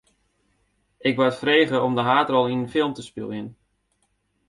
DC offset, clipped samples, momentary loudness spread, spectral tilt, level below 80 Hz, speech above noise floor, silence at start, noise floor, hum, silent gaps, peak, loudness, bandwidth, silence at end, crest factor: under 0.1%; under 0.1%; 14 LU; -6 dB/octave; -64 dBFS; 49 dB; 1.05 s; -70 dBFS; none; none; -4 dBFS; -22 LUFS; 11.5 kHz; 0.95 s; 20 dB